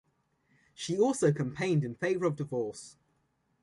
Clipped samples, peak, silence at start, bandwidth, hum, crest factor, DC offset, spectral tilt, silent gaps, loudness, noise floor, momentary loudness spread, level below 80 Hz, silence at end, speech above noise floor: under 0.1%; -14 dBFS; 0.8 s; 11.5 kHz; none; 18 dB; under 0.1%; -6 dB/octave; none; -31 LUFS; -75 dBFS; 14 LU; -70 dBFS; 0.7 s; 45 dB